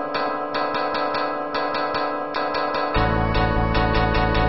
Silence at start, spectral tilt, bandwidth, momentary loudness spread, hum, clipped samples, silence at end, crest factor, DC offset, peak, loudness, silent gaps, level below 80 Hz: 0 s; -4 dB/octave; 6 kHz; 4 LU; none; under 0.1%; 0 s; 16 dB; 1%; -6 dBFS; -22 LUFS; none; -30 dBFS